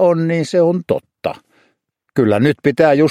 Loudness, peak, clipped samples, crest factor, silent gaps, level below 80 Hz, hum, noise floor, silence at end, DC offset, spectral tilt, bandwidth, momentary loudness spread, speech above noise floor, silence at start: -16 LUFS; 0 dBFS; under 0.1%; 16 dB; none; -56 dBFS; none; -65 dBFS; 0 s; under 0.1%; -7.5 dB/octave; 13 kHz; 12 LU; 52 dB; 0 s